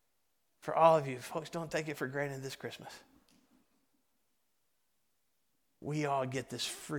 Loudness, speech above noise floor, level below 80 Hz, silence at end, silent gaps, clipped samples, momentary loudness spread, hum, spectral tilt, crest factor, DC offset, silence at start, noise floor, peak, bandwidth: -34 LUFS; 47 dB; -74 dBFS; 0 s; none; under 0.1%; 20 LU; none; -5 dB/octave; 26 dB; under 0.1%; 0.65 s; -82 dBFS; -12 dBFS; 18 kHz